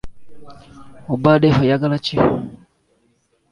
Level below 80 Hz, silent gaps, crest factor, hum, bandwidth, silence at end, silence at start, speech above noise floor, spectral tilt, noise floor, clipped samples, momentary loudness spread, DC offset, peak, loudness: -44 dBFS; none; 18 dB; none; 11 kHz; 0.95 s; 0.05 s; 45 dB; -8 dB/octave; -63 dBFS; under 0.1%; 15 LU; under 0.1%; -2 dBFS; -17 LUFS